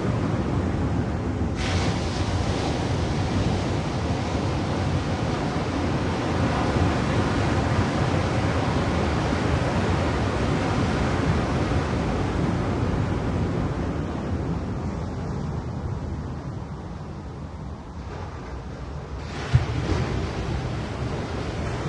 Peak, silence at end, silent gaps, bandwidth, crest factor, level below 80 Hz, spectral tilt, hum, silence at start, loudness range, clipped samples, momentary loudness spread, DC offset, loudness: -6 dBFS; 0 s; none; 11 kHz; 20 dB; -36 dBFS; -6.5 dB/octave; none; 0 s; 8 LU; under 0.1%; 11 LU; under 0.1%; -26 LUFS